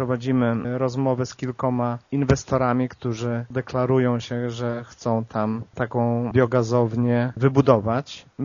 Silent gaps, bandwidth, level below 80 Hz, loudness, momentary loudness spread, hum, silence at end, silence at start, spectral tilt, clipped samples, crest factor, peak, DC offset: none; 7.2 kHz; -48 dBFS; -23 LUFS; 8 LU; none; 0 s; 0 s; -7.5 dB/octave; under 0.1%; 22 dB; 0 dBFS; under 0.1%